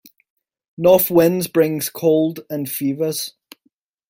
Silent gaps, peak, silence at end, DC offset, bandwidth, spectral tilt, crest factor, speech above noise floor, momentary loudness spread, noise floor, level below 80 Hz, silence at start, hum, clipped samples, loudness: none; -2 dBFS; 0.8 s; under 0.1%; 17 kHz; -5.5 dB/octave; 18 dB; 48 dB; 12 LU; -65 dBFS; -58 dBFS; 0.8 s; none; under 0.1%; -18 LUFS